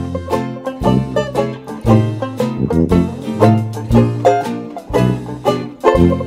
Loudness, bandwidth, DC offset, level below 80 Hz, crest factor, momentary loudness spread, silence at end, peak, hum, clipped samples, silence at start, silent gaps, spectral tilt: -16 LUFS; 15 kHz; under 0.1%; -32 dBFS; 14 dB; 8 LU; 0 s; 0 dBFS; none; under 0.1%; 0 s; none; -8 dB/octave